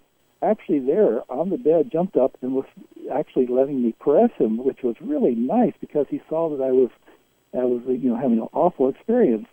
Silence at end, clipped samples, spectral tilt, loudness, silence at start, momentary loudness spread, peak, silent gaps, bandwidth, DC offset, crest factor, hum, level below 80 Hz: 0.1 s; under 0.1%; -10 dB/octave; -22 LUFS; 0.4 s; 7 LU; -6 dBFS; none; 3.6 kHz; under 0.1%; 16 dB; none; -64 dBFS